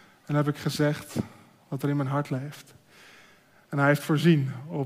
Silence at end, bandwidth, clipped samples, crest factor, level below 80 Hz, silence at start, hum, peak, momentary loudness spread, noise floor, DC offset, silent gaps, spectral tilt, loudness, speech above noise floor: 0 s; 15.5 kHz; under 0.1%; 18 dB; -66 dBFS; 0.3 s; none; -8 dBFS; 14 LU; -57 dBFS; under 0.1%; none; -6.5 dB/octave; -27 LUFS; 31 dB